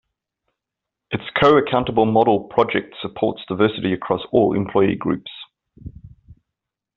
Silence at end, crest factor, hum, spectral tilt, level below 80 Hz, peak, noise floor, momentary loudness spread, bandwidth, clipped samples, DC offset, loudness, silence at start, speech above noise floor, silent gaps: 0.65 s; 18 dB; none; -4.5 dB/octave; -52 dBFS; -2 dBFS; -84 dBFS; 15 LU; 7 kHz; under 0.1%; under 0.1%; -19 LUFS; 1.1 s; 66 dB; none